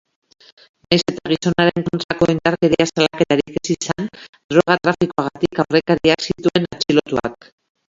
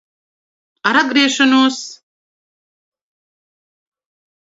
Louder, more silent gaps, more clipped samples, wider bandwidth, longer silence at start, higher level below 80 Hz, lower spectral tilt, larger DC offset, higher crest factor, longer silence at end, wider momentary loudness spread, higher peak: second, -18 LUFS vs -13 LUFS; first, 2.04-2.09 s, 4.29-4.33 s, 4.44-4.49 s vs none; neither; about the same, 7.8 kHz vs 7.8 kHz; about the same, 0.9 s vs 0.85 s; first, -50 dBFS vs -68 dBFS; first, -5 dB/octave vs -1.5 dB/octave; neither; about the same, 18 dB vs 20 dB; second, 0.55 s vs 2.45 s; second, 7 LU vs 14 LU; about the same, 0 dBFS vs 0 dBFS